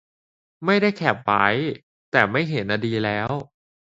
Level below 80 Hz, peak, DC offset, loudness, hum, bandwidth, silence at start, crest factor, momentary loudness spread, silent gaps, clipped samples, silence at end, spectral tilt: -58 dBFS; 0 dBFS; under 0.1%; -22 LUFS; none; 7.8 kHz; 0.6 s; 22 dB; 9 LU; 1.83-2.12 s; under 0.1%; 0.5 s; -7 dB/octave